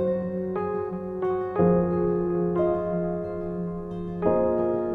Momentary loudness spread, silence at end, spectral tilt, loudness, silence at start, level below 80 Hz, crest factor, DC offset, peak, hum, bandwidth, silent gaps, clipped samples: 9 LU; 0 s; -11.5 dB/octave; -26 LUFS; 0 s; -48 dBFS; 16 dB; under 0.1%; -8 dBFS; none; 3.9 kHz; none; under 0.1%